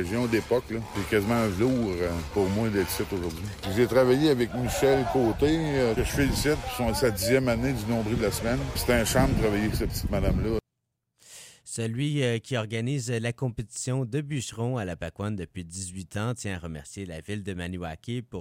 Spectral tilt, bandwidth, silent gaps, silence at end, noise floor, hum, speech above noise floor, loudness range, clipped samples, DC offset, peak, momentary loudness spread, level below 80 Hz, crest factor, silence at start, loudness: -5.5 dB/octave; 16 kHz; none; 0 s; -81 dBFS; none; 55 dB; 8 LU; under 0.1%; under 0.1%; -10 dBFS; 12 LU; -40 dBFS; 16 dB; 0 s; -27 LUFS